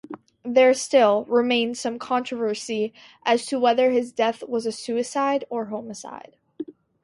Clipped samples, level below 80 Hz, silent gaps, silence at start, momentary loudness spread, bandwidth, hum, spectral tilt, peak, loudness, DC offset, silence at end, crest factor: under 0.1%; -72 dBFS; none; 0.1 s; 19 LU; 11.5 kHz; none; -3.5 dB/octave; -6 dBFS; -22 LUFS; under 0.1%; 0.3 s; 18 dB